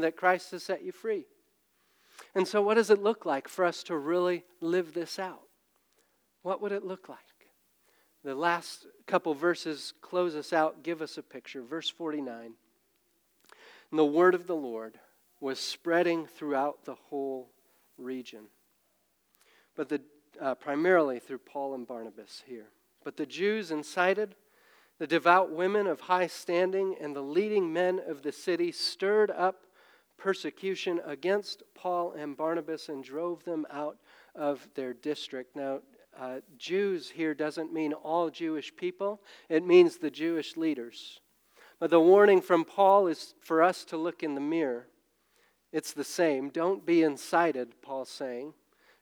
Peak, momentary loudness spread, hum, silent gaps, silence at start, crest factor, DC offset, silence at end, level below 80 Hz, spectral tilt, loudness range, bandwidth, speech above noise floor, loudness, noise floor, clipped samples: -8 dBFS; 17 LU; none; none; 0 s; 22 dB; under 0.1%; 0.5 s; under -90 dBFS; -5 dB/octave; 11 LU; over 20 kHz; 43 dB; -30 LUFS; -73 dBFS; under 0.1%